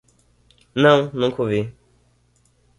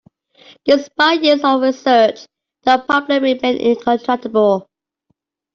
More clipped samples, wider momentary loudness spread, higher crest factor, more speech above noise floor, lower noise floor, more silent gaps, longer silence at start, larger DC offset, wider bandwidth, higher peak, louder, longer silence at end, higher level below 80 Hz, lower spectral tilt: neither; first, 14 LU vs 5 LU; first, 20 dB vs 14 dB; second, 43 dB vs 54 dB; second, -61 dBFS vs -68 dBFS; neither; about the same, 0.75 s vs 0.65 s; neither; first, 11 kHz vs 7.4 kHz; about the same, -2 dBFS vs -2 dBFS; second, -19 LUFS vs -15 LUFS; first, 1.1 s vs 0.9 s; about the same, -56 dBFS vs -60 dBFS; first, -6.5 dB/octave vs -4.5 dB/octave